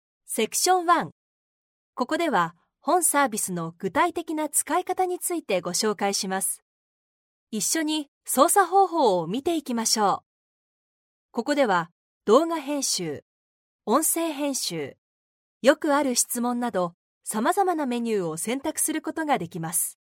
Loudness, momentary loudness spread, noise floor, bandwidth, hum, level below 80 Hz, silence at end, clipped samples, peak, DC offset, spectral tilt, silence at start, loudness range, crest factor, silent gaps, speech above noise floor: -24 LUFS; 11 LU; under -90 dBFS; 17 kHz; none; -72 dBFS; 0.1 s; under 0.1%; -4 dBFS; under 0.1%; -3 dB/octave; 0.3 s; 3 LU; 22 dB; 1.12-1.93 s, 6.62-7.47 s, 8.08-8.21 s, 10.26-11.29 s, 11.92-12.21 s, 13.22-13.79 s, 14.98-15.61 s, 16.94-17.21 s; over 66 dB